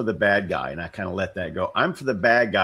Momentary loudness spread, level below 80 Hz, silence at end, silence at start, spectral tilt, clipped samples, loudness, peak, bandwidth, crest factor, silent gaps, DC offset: 10 LU; -52 dBFS; 0 s; 0 s; -6 dB/octave; under 0.1%; -23 LUFS; -4 dBFS; 12.5 kHz; 20 dB; none; under 0.1%